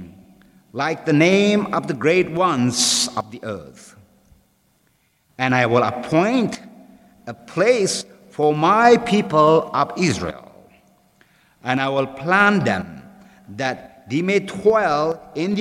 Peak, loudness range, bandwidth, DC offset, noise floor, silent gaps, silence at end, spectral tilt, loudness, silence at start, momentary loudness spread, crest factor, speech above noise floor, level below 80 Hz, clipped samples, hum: 0 dBFS; 5 LU; 15.5 kHz; under 0.1%; -63 dBFS; none; 0 s; -4.5 dB/octave; -18 LUFS; 0 s; 17 LU; 20 dB; 44 dB; -56 dBFS; under 0.1%; none